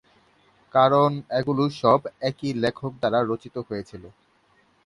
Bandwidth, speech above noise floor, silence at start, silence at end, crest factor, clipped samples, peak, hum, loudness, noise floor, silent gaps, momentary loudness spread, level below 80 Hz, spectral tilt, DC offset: 11 kHz; 39 dB; 0.75 s; 0.75 s; 20 dB; under 0.1%; -4 dBFS; none; -23 LUFS; -62 dBFS; none; 14 LU; -60 dBFS; -7 dB/octave; under 0.1%